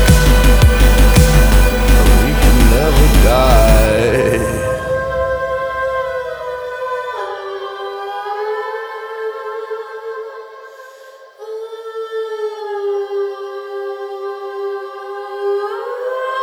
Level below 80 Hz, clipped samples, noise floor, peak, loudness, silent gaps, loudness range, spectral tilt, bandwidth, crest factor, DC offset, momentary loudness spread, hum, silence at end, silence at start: -16 dBFS; under 0.1%; -39 dBFS; 0 dBFS; -16 LUFS; none; 15 LU; -5.5 dB/octave; over 20 kHz; 14 dB; under 0.1%; 16 LU; none; 0 s; 0 s